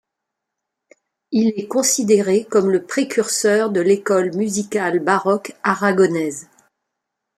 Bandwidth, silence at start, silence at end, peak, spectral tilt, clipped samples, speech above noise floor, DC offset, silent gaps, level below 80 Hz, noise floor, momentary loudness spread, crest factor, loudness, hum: 15 kHz; 1.3 s; 0.95 s; -2 dBFS; -4 dB/octave; under 0.1%; 63 dB; under 0.1%; none; -66 dBFS; -81 dBFS; 6 LU; 18 dB; -18 LUFS; none